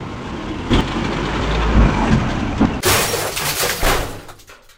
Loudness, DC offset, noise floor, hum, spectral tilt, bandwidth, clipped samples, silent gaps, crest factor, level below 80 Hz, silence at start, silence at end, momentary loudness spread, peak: -18 LUFS; under 0.1%; -40 dBFS; none; -4 dB/octave; 16.5 kHz; under 0.1%; none; 18 dB; -24 dBFS; 0 s; 0.2 s; 12 LU; 0 dBFS